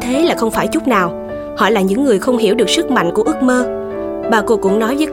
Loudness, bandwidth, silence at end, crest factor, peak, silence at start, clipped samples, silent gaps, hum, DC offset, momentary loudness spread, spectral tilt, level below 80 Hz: -14 LUFS; 17 kHz; 0 s; 14 dB; 0 dBFS; 0 s; under 0.1%; none; none; under 0.1%; 8 LU; -4.5 dB/octave; -42 dBFS